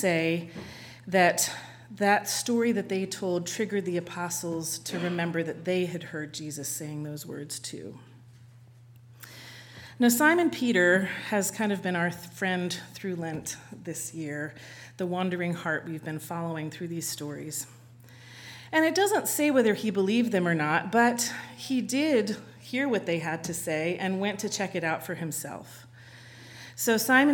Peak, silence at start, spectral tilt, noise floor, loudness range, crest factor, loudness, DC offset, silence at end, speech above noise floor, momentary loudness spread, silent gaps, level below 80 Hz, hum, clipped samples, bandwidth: -8 dBFS; 0 s; -4 dB/octave; -52 dBFS; 8 LU; 22 dB; -28 LUFS; under 0.1%; 0 s; 24 dB; 20 LU; none; -72 dBFS; none; under 0.1%; 19 kHz